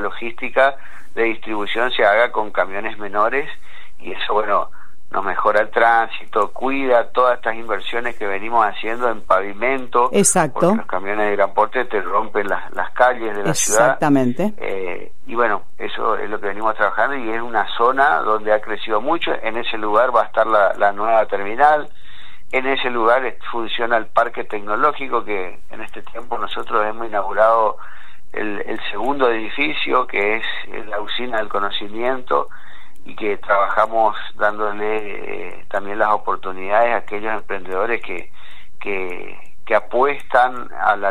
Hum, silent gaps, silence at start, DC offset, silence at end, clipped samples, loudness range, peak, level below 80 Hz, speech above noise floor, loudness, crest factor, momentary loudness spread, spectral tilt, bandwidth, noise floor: none; none; 0 s; 8%; 0 s; under 0.1%; 4 LU; 0 dBFS; -52 dBFS; 24 dB; -19 LUFS; 18 dB; 12 LU; -3.5 dB/octave; 15.5 kHz; -44 dBFS